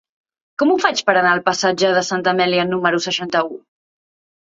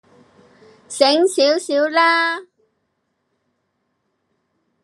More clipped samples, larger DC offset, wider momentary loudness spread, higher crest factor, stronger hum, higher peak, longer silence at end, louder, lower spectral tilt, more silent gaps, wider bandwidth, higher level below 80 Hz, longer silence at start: neither; neither; second, 6 LU vs 10 LU; about the same, 18 dB vs 20 dB; neither; about the same, 0 dBFS vs 0 dBFS; second, 0.85 s vs 2.4 s; about the same, -17 LUFS vs -16 LUFS; first, -3.5 dB/octave vs -1 dB/octave; neither; second, 7.8 kHz vs 13 kHz; first, -66 dBFS vs -80 dBFS; second, 0.6 s vs 0.9 s